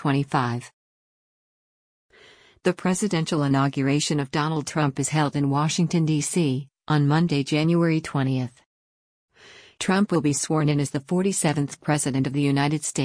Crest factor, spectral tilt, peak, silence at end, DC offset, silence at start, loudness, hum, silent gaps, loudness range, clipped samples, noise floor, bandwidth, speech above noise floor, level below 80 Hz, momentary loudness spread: 16 dB; -5.5 dB/octave; -8 dBFS; 0 s; under 0.1%; 0 s; -23 LUFS; none; 0.73-2.09 s, 8.66-9.28 s; 4 LU; under 0.1%; -53 dBFS; 10.5 kHz; 31 dB; -60 dBFS; 5 LU